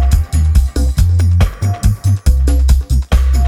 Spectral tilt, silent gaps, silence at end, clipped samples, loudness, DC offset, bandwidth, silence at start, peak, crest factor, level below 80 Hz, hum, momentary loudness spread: -6.5 dB/octave; none; 0 s; under 0.1%; -14 LUFS; under 0.1%; 15 kHz; 0 s; -2 dBFS; 10 dB; -12 dBFS; none; 3 LU